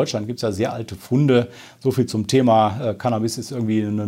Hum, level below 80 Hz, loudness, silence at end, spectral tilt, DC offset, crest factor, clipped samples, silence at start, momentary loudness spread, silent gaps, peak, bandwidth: none; -60 dBFS; -20 LUFS; 0 s; -6.5 dB/octave; under 0.1%; 16 dB; under 0.1%; 0 s; 9 LU; none; -4 dBFS; 16 kHz